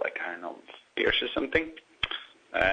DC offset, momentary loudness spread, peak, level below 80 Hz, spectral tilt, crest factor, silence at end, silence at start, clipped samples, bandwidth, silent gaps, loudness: under 0.1%; 15 LU; -8 dBFS; -52 dBFS; -5 dB/octave; 22 dB; 0 s; 0 s; under 0.1%; 9.2 kHz; none; -30 LUFS